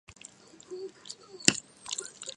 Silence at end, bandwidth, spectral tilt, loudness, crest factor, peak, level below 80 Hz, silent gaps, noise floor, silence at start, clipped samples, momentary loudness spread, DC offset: 0 s; 11.5 kHz; -1.5 dB/octave; -29 LUFS; 36 dB; 0 dBFS; -68 dBFS; none; -53 dBFS; 0.1 s; under 0.1%; 24 LU; under 0.1%